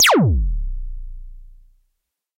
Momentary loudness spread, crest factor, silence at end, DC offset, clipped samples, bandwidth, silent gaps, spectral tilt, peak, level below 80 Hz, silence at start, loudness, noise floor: 24 LU; 16 dB; 0.9 s; under 0.1%; under 0.1%; 16 kHz; none; -4 dB/octave; -4 dBFS; -26 dBFS; 0 s; -19 LUFS; -74 dBFS